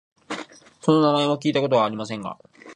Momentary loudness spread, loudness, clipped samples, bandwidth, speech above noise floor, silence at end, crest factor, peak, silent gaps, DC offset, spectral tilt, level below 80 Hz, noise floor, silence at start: 16 LU; -21 LUFS; under 0.1%; 10 kHz; 20 dB; 0 s; 20 dB; -2 dBFS; none; under 0.1%; -6 dB/octave; -68 dBFS; -41 dBFS; 0.3 s